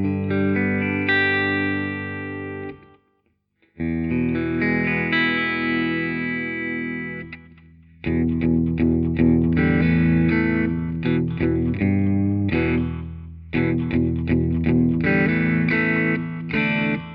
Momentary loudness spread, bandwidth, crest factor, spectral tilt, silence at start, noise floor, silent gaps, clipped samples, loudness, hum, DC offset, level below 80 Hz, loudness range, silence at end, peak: 11 LU; 5.2 kHz; 14 dB; -10 dB/octave; 0 s; -68 dBFS; none; under 0.1%; -21 LUFS; 50 Hz at -45 dBFS; under 0.1%; -38 dBFS; 5 LU; 0 s; -6 dBFS